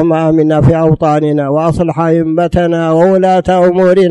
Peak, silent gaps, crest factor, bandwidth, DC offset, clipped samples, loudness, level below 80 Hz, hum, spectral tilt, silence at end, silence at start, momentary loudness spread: 0 dBFS; none; 8 dB; 11 kHz; under 0.1%; under 0.1%; -10 LUFS; -32 dBFS; none; -8.5 dB/octave; 0 s; 0 s; 4 LU